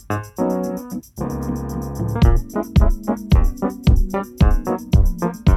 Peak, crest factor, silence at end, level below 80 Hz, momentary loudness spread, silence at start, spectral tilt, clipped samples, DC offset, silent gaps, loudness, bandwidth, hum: -2 dBFS; 16 dB; 0 s; -20 dBFS; 9 LU; 0.1 s; -7.5 dB/octave; under 0.1%; under 0.1%; none; -20 LUFS; 13.5 kHz; none